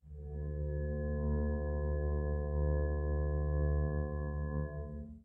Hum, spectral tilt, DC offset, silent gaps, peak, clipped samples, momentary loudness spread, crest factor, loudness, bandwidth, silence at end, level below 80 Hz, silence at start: 60 Hz at -60 dBFS; -13 dB/octave; under 0.1%; none; -22 dBFS; under 0.1%; 8 LU; 12 dB; -37 LUFS; 1.8 kHz; 0.05 s; -36 dBFS; 0.05 s